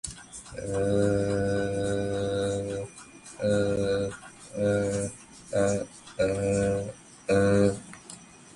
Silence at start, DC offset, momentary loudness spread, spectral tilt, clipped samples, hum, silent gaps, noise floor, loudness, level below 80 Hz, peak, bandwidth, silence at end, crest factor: 0.05 s; under 0.1%; 17 LU; -6 dB/octave; under 0.1%; none; none; -48 dBFS; -28 LUFS; -50 dBFS; -10 dBFS; 11.5 kHz; 0.2 s; 18 dB